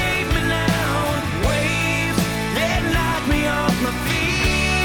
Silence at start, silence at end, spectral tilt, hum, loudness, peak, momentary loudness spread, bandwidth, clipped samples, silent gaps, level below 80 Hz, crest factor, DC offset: 0 s; 0 s; -4.5 dB/octave; none; -20 LUFS; -4 dBFS; 3 LU; over 20 kHz; under 0.1%; none; -30 dBFS; 16 dB; under 0.1%